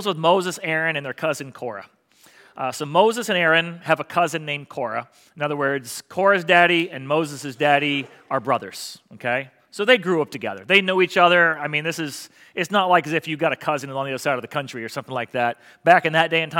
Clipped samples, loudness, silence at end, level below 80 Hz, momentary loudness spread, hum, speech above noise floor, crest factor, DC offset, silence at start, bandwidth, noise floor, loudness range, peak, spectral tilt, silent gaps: under 0.1%; -21 LUFS; 0 s; -76 dBFS; 14 LU; none; 31 dB; 22 dB; under 0.1%; 0 s; 17 kHz; -53 dBFS; 4 LU; 0 dBFS; -4 dB/octave; none